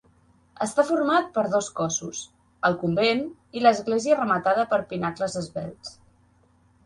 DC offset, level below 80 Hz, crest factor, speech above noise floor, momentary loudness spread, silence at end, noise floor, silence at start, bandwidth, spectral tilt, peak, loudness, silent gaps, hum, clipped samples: under 0.1%; -62 dBFS; 20 dB; 37 dB; 14 LU; 0.95 s; -61 dBFS; 0.6 s; 11.5 kHz; -4.5 dB/octave; -4 dBFS; -24 LUFS; none; none; under 0.1%